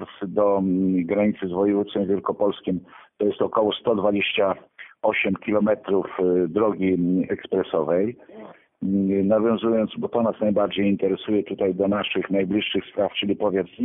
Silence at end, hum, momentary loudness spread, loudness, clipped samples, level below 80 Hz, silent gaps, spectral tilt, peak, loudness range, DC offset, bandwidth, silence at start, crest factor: 0 s; none; 4 LU; -23 LUFS; under 0.1%; -60 dBFS; none; -11 dB/octave; -6 dBFS; 1 LU; under 0.1%; 3.9 kHz; 0 s; 16 dB